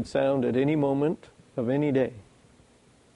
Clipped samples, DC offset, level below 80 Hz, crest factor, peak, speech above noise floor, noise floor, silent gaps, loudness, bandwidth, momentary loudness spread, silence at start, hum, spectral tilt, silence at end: under 0.1%; under 0.1%; -60 dBFS; 14 dB; -12 dBFS; 34 dB; -59 dBFS; none; -26 LUFS; 11 kHz; 8 LU; 0 s; none; -8 dB/octave; 0.95 s